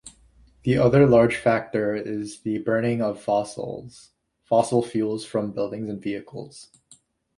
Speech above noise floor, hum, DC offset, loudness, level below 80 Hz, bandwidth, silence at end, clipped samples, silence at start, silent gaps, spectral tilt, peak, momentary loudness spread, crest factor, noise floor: 34 dB; none; under 0.1%; -23 LUFS; -54 dBFS; 11.5 kHz; 0.75 s; under 0.1%; 0.05 s; none; -7 dB/octave; -4 dBFS; 17 LU; 18 dB; -57 dBFS